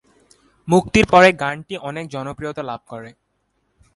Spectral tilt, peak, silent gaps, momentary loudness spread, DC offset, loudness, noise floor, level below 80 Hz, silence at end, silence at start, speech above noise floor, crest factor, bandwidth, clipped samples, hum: -5.5 dB/octave; -2 dBFS; none; 22 LU; under 0.1%; -17 LUFS; -68 dBFS; -44 dBFS; 0.85 s; 0.65 s; 50 dB; 18 dB; 11.5 kHz; under 0.1%; none